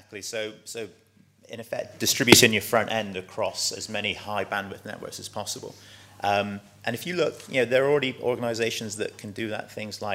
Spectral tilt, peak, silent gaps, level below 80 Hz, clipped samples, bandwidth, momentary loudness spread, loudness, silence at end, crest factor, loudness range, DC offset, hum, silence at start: -3 dB/octave; 0 dBFS; none; -64 dBFS; under 0.1%; 16 kHz; 16 LU; -25 LUFS; 0 s; 26 dB; 8 LU; under 0.1%; none; 0.1 s